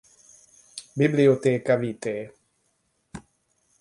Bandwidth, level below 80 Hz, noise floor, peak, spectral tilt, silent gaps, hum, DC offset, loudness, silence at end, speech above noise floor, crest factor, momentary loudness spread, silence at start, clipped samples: 11.5 kHz; -64 dBFS; -71 dBFS; -6 dBFS; -7 dB/octave; none; none; under 0.1%; -23 LUFS; 0.6 s; 49 dB; 20 dB; 25 LU; 0.75 s; under 0.1%